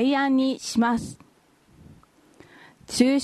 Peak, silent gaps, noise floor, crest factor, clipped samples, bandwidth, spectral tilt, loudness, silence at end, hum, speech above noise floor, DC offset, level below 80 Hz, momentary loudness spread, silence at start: -6 dBFS; none; -59 dBFS; 18 dB; under 0.1%; 13 kHz; -4 dB/octave; -23 LUFS; 0 s; none; 37 dB; under 0.1%; -58 dBFS; 10 LU; 0 s